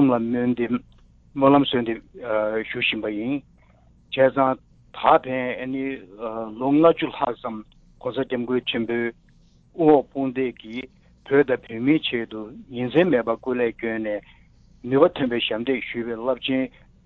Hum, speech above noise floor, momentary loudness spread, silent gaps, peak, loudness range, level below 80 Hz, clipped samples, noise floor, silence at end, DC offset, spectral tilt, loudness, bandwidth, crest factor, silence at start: none; 33 dB; 15 LU; none; -4 dBFS; 2 LU; -56 dBFS; under 0.1%; -55 dBFS; 0.35 s; under 0.1%; -8.5 dB/octave; -23 LUFS; 4.3 kHz; 18 dB; 0 s